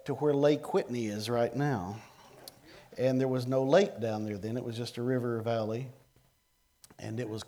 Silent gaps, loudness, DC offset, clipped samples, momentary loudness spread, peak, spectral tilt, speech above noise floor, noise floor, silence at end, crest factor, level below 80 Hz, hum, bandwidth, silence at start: none; -31 LUFS; under 0.1%; under 0.1%; 20 LU; -12 dBFS; -6.5 dB/octave; 41 dB; -72 dBFS; 0.05 s; 20 dB; -72 dBFS; none; over 20 kHz; 0.05 s